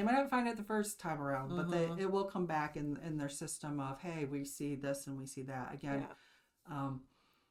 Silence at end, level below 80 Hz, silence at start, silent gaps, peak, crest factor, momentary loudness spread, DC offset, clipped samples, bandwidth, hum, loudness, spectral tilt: 0.5 s; -68 dBFS; 0 s; none; -22 dBFS; 16 dB; 8 LU; under 0.1%; under 0.1%; 16.5 kHz; none; -39 LUFS; -5.5 dB/octave